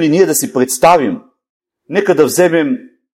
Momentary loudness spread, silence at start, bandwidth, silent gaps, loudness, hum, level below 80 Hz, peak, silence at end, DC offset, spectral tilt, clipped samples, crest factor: 10 LU; 0 s; 17 kHz; 1.50-1.60 s; -12 LUFS; none; -54 dBFS; 0 dBFS; 0.3 s; under 0.1%; -4.5 dB/octave; 0.1%; 14 dB